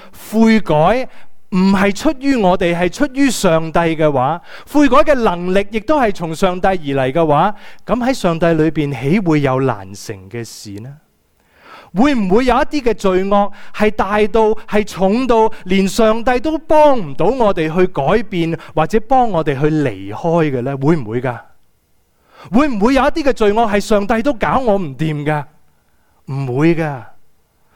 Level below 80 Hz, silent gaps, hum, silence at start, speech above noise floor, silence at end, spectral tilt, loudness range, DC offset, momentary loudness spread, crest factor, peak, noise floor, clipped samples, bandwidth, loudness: -34 dBFS; none; none; 0 s; 43 dB; 0.6 s; -6.5 dB/octave; 4 LU; under 0.1%; 9 LU; 14 dB; 0 dBFS; -57 dBFS; under 0.1%; 18 kHz; -15 LUFS